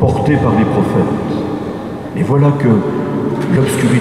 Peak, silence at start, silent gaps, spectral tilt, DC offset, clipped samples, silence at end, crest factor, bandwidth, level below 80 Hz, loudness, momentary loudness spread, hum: -2 dBFS; 0 s; none; -7.5 dB/octave; 0.2%; under 0.1%; 0 s; 12 dB; 14 kHz; -40 dBFS; -14 LUFS; 9 LU; none